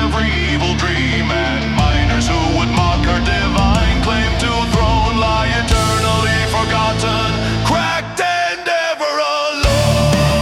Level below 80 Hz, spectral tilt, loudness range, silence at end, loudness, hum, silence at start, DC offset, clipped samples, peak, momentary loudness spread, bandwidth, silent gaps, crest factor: -22 dBFS; -5 dB/octave; 1 LU; 0 s; -15 LUFS; none; 0 s; under 0.1%; under 0.1%; -2 dBFS; 3 LU; 15.5 kHz; none; 14 dB